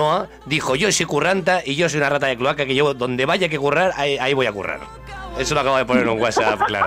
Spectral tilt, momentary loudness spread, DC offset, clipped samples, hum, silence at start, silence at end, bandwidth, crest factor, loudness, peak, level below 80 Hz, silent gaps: -4 dB/octave; 7 LU; under 0.1%; under 0.1%; none; 0 s; 0 s; 16 kHz; 12 dB; -19 LUFS; -6 dBFS; -46 dBFS; none